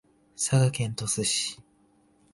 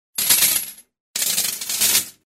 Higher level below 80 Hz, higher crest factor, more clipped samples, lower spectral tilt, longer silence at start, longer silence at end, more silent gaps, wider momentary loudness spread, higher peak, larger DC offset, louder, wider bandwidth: about the same, -60 dBFS vs -62 dBFS; about the same, 18 dB vs 20 dB; neither; first, -4 dB/octave vs 1.5 dB/octave; first, 0.4 s vs 0.15 s; first, 0.75 s vs 0.15 s; second, none vs 1.00-1.14 s; about the same, 9 LU vs 11 LU; second, -12 dBFS vs -2 dBFS; neither; second, -26 LUFS vs -17 LUFS; second, 11.5 kHz vs 16.5 kHz